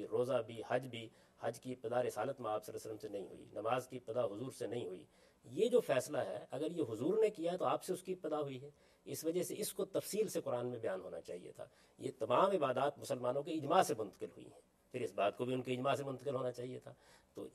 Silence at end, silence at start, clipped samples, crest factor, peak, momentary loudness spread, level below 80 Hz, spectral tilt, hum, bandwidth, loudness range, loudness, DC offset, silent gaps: 0.05 s; 0 s; under 0.1%; 22 dB; -18 dBFS; 16 LU; -80 dBFS; -5 dB/octave; none; 14.5 kHz; 5 LU; -39 LUFS; under 0.1%; none